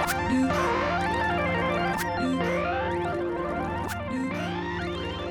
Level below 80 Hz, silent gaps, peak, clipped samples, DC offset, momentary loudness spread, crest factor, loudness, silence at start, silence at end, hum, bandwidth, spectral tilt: -46 dBFS; none; -14 dBFS; under 0.1%; under 0.1%; 6 LU; 14 dB; -27 LUFS; 0 s; 0 s; none; over 20 kHz; -5.5 dB/octave